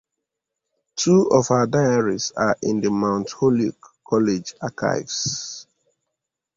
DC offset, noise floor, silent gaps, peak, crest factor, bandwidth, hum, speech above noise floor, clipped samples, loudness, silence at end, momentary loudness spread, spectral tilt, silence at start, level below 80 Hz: under 0.1%; -82 dBFS; none; -4 dBFS; 18 dB; 7.8 kHz; none; 62 dB; under 0.1%; -21 LUFS; 0.95 s; 10 LU; -5 dB/octave; 0.95 s; -56 dBFS